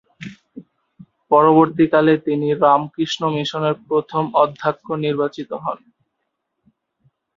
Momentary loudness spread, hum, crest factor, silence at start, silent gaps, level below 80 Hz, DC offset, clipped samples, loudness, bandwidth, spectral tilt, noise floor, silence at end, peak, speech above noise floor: 13 LU; none; 18 dB; 0.2 s; none; -62 dBFS; under 0.1%; under 0.1%; -18 LUFS; 7.4 kHz; -6.5 dB/octave; -75 dBFS; 1.6 s; -2 dBFS; 58 dB